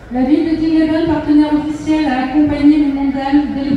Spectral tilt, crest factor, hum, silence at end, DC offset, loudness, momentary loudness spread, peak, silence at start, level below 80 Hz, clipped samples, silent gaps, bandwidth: -7 dB/octave; 12 dB; none; 0 s; under 0.1%; -14 LUFS; 4 LU; -2 dBFS; 0 s; -36 dBFS; under 0.1%; none; 7.8 kHz